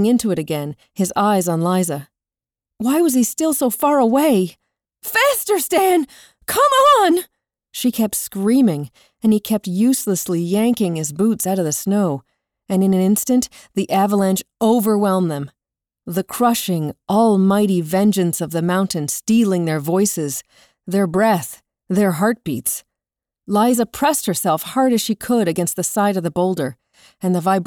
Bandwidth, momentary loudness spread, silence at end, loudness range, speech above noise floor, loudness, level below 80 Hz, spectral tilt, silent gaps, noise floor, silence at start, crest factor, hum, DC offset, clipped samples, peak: over 20 kHz; 9 LU; 0 s; 3 LU; over 73 dB; -18 LUFS; -58 dBFS; -5 dB/octave; none; under -90 dBFS; 0 s; 14 dB; none; under 0.1%; under 0.1%; -4 dBFS